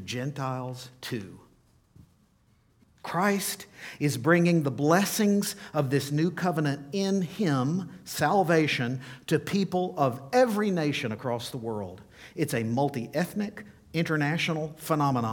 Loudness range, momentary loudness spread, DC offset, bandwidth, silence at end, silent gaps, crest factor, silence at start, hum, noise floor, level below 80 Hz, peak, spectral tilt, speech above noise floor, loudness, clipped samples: 7 LU; 13 LU; under 0.1%; 19 kHz; 0 s; none; 20 dB; 0 s; none; -65 dBFS; -66 dBFS; -8 dBFS; -5.5 dB/octave; 37 dB; -28 LUFS; under 0.1%